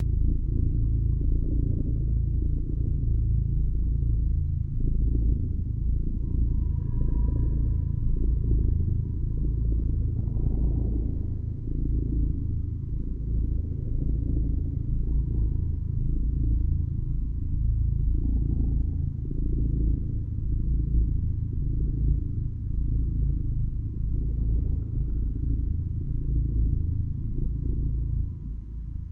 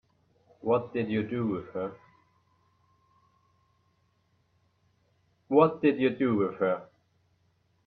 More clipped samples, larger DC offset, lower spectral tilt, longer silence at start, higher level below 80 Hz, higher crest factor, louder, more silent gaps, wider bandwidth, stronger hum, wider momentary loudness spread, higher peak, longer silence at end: neither; neither; first, -13.5 dB/octave vs -10 dB/octave; second, 0 s vs 0.65 s; first, -26 dBFS vs -72 dBFS; second, 14 dB vs 24 dB; about the same, -29 LUFS vs -28 LUFS; neither; second, 1.1 kHz vs 4.5 kHz; neither; second, 5 LU vs 13 LU; second, -12 dBFS vs -8 dBFS; second, 0 s vs 1 s